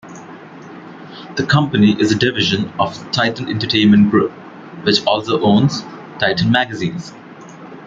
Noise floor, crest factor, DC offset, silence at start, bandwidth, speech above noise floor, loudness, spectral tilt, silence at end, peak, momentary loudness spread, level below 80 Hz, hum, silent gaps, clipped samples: -36 dBFS; 16 dB; under 0.1%; 0.05 s; 7.6 kHz; 21 dB; -15 LUFS; -5.5 dB/octave; 0 s; 0 dBFS; 23 LU; -52 dBFS; none; none; under 0.1%